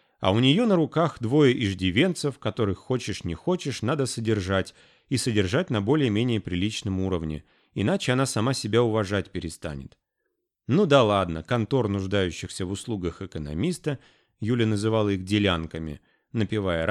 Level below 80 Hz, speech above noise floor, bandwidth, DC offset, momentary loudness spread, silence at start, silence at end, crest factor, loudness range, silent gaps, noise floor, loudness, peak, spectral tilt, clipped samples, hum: -50 dBFS; 54 dB; 13 kHz; under 0.1%; 14 LU; 0.2 s; 0 s; 18 dB; 3 LU; none; -79 dBFS; -25 LUFS; -6 dBFS; -6 dB/octave; under 0.1%; none